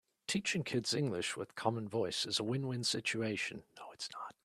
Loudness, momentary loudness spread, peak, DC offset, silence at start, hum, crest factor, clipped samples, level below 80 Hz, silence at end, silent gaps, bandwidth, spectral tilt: -37 LUFS; 10 LU; -18 dBFS; under 0.1%; 0.3 s; none; 20 dB; under 0.1%; -74 dBFS; 0.15 s; none; 14 kHz; -4 dB/octave